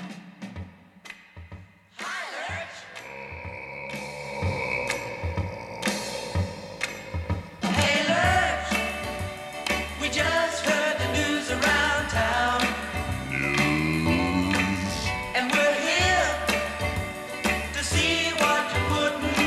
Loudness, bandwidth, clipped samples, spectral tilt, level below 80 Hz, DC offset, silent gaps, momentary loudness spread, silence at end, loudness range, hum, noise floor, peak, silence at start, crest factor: -25 LUFS; 15.5 kHz; under 0.1%; -4 dB/octave; -42 dBFS; under 0.1%; none; 16 LU; 0 s; 10 LU; none; -47 dBFS; -10 dBFS; 0 s; 18 dB